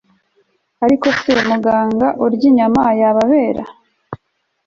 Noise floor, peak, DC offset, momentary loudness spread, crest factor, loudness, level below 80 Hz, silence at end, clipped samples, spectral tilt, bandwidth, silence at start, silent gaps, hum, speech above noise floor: -67 dBFS; -2 dBFS; under 0.1%; 22 LU; 14 dB; -14 LUFS; -50 dBFS; 0.5 s; under 0.1%; -6 dB/octave; 7.4 kHz; 0.8 s; none; none; 54 dB